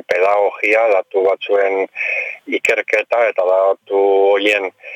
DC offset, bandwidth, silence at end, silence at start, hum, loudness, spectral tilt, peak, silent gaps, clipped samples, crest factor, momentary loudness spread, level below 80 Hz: under 0.1%; 13 kHz; 0 s; 0.1 s; none; -15 LUFS; -2.5 dB/octave; -4 dBFS; none; under 0.1%; 12 dB; 6 LU; -68 dBFS